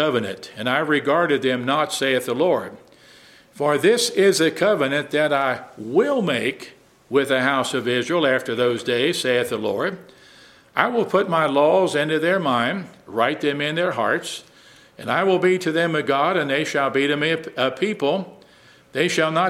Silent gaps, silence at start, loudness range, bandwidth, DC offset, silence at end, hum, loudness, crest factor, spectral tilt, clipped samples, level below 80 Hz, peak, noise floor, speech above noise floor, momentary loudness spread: none; 0 s; 2 LU; 16 kHz; under 0.1%; 0 s; none; -20 LUFS; 20 dB; -4.5 dB/octave; under 0.1%; -68 dBFS; 0 dBFS; -51 dBFS; 31 dB; 9 LU